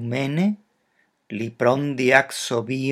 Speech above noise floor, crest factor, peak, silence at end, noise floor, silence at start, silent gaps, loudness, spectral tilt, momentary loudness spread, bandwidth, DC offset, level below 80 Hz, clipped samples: 46 dB; 22 dB; 0 dBFS; 0 s; -67 dBFS; 0 s; none; -21 LUFS; -5 dB/octave; 14 LU; 14.5 kHz; under 0.1%; -70 dBFS; under 0.1%